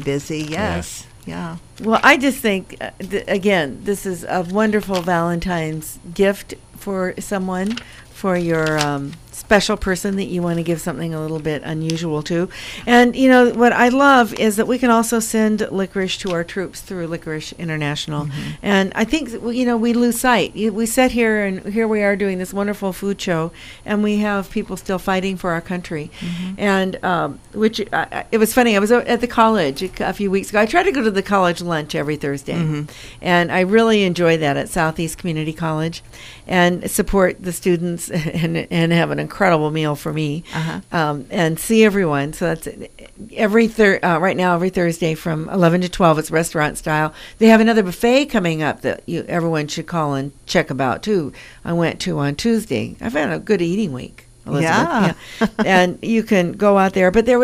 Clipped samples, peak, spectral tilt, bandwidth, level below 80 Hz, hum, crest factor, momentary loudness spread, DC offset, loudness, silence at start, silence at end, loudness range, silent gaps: under 0.1%; 0 dBFS; -5.5 dB/octave; 15.5 kHz; -42 dBFS; none; 18 dB; 12 LU; under 0.1%; -18 LUFS; 0 s; 0 s; 5 LU; none